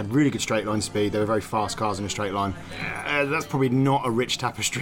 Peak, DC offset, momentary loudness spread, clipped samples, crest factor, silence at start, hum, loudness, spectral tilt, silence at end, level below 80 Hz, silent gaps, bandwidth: -10 dBFS; under 0.1%; 6 LU; under 0.1%; 14 dB; 0 s; none; -25 LUFS; -4.5 dB/octave; 0 s; -50 dBFS; none; 17 kHz